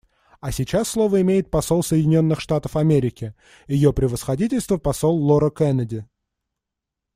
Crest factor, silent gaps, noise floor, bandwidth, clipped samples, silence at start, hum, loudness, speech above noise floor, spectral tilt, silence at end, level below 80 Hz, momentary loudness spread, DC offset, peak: 16 dB; none; -84 dBFS; 16 kHz; under 0.1%; 0.45 s; none; -20 LUFS; 64 dB; -7 dB/octave; 1.1 s; -40 dBFS; 10 LU; under 0.1%; -4 dBFS